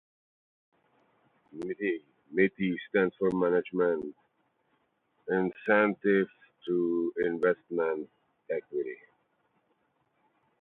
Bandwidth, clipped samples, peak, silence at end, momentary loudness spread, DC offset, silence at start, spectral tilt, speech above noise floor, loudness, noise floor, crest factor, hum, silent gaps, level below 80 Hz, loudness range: 4.2 kHz; under 0.1%; -10 dBFS; 1.65 s; 14 LU; under 0.1%; 1.55 s; -8.5 dB/octave; 45 dB; -30 LUFS; -74 dBFS; 22 dB; none; none; -72 dBFS; 4 LU